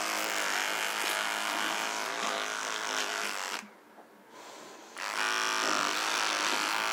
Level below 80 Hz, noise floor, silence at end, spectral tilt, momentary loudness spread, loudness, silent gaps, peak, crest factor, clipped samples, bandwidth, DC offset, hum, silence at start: under -90 dBFS; -55 dBFS; 0 s; 0.5 dB/octave; 12 LU; -30 LUFS; none; -14 dBFS; 20 dB; under 0.1%; 19 kHz; under 0.1%; none; 0 s